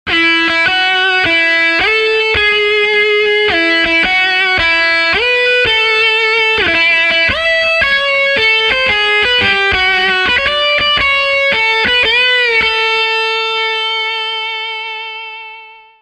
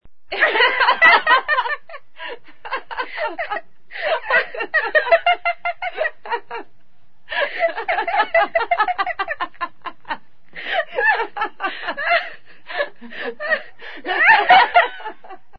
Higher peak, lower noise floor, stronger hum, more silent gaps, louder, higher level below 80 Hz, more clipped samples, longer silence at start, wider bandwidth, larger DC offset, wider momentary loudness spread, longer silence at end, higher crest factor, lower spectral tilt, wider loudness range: about the same, 0 dBFS vs 0 dBFS; second, -35 dBFS vs -61 dBFS; neither; neither; first, -10 LUFS vs -18 LUFS; first, -40 dBFS vs -56 dBFS; neither; about the same, 0.05 s vs 0 s; first, 10.5 kHz vs 6.2 kHz; second, under 0.1% vs 2%; second, 6 LU vs 20 LU; first, 0.3 s vs 0 s; second, 12 dB vs 20 dB; about the same, -2.5 dB/octave vs -3.5 dB/octave; second, 2 LU vs 6 LU